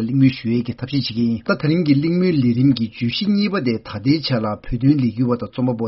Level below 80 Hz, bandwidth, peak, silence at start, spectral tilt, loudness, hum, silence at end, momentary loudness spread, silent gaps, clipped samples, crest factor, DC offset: -44 dBFS; 6 kHz; -2 dBFS; 0 s; -6.5 dB/octave; -19 LUFS; none; 0 s; 6 LU; none; under 0.1%; 16 dB; under 0.1%